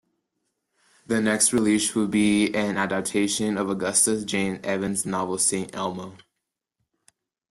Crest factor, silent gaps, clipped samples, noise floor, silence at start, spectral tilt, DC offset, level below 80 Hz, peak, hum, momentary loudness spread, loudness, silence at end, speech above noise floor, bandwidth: 18 dB; none; under 0.1%; -83 dBFS; 1.1 s; -3.5 dB/octave; under 0.1%; -62 dBFS; -6 dBFS; none; 9 LU; -23 LUFS; 1.35 s; 59 dB; 12.5 kHz